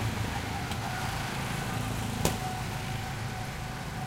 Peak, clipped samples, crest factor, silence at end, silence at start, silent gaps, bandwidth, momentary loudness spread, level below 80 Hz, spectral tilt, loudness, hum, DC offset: -10 dBFS; under 0.1%; 24 dB; 0 s; 0 s; none; 16.5 kHz; 6 LU; -44 dBFS; -4.5 dB/octave; -33 LUFS; none; under 0.1%